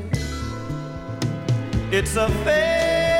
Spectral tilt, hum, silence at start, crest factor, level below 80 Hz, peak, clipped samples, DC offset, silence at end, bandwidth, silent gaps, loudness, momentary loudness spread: -5 dB/octave; none; 0 s; 14 dB; -34 dBFS; -8 dBFS; under 0.1%; under 0.1%; 0 s; 16.5 kHz; none; -23 LUFS; 11 LU